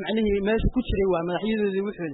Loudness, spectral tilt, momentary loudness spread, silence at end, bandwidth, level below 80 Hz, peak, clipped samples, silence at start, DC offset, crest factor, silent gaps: -25 LUFS; -11 dB/octave; 3 LU; 0 s; 4.1 kHz; -34 dBFS; -12 dBFS; under 0.1%; 0 s; under 0.1%; 12 dB; none